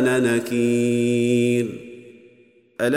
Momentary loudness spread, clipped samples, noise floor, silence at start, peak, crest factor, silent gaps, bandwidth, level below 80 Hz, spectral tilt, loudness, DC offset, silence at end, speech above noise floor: 19 LU; under 0.1%; -54 dBFS; 0 s; -8 dBFS; 14 dB; none; 15.5 kHz; -66 dBFS; -6 dB/octave; -20 LUFS; under 0.1%; 0 s; 35 dB